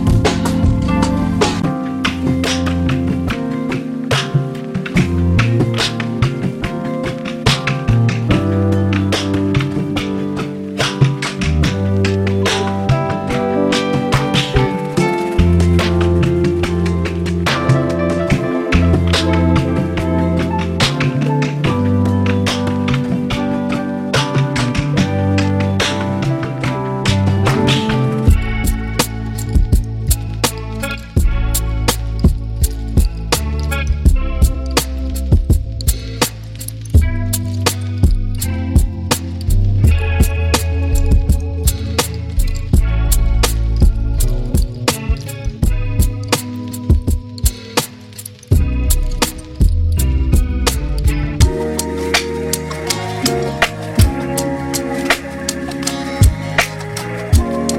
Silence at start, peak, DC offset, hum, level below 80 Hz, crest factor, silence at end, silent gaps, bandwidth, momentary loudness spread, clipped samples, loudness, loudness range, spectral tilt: 0 s; 0 dBFS; under 0.1%; none; -20 dBFS; 16 dB; 0 s; none; 16.5 kHz; 6 LU; under 0.1%; -17 LUFS; 3 LU; -5.5 dB/octave